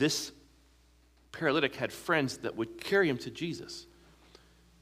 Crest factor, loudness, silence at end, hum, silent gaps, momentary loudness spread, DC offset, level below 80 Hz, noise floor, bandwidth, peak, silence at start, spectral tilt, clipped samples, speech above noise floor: 22 dB; -32 LUFS; 1 s; none; none; 15 LU; under 0.1%; -64 dBFS; -63 dBFS; 15.5 kHz; -12 dBFS; 0 s; -4 dB/octave; under 0.1%; 32 dB